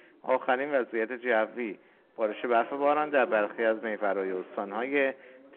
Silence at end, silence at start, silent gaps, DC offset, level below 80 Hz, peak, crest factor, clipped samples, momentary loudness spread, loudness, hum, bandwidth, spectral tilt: 0 s; 0.25 s; none; under 0.1%; -84 dBFS; -12 dBFS; 16 dB; under 0.1%; 9 LU; -29 LUFS; none; 4.2 kHz; -2.5 dB/octave